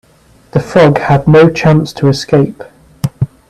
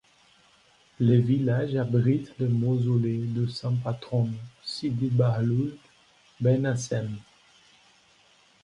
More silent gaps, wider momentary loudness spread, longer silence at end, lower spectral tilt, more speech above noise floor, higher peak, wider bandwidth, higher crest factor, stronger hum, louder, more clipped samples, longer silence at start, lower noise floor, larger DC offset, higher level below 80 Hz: neither; about the same, 11 LU vs 9 LU; second, 0.25 s vs 1.4 s; about the same, -7 dB/octave vs -7.5 dB/octave; about the same, 37 dB vs 36 dB; first, 0 dBFS vs -10 dBFS; first, 12.5 kHz vs 10 kHz; second, 10 dB vs 18 dB; neither; first, -10 LUFS vs -26 LUFS; neither; second, 0.55 s vs 1 s; second, -46 dBFS vs -60 dBFS; neither; first, -40 dBFS vs -62 dBFS